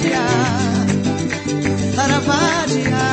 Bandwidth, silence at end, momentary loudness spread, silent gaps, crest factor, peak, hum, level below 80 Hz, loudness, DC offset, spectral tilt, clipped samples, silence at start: 8.8 kHz; 0 s; 4 LU; none; 14 dB; -2 dBFS; none; -44 dBFS; -17 LUFS; under 0.1%; -5 dB/octave; under 0.1%; 0 s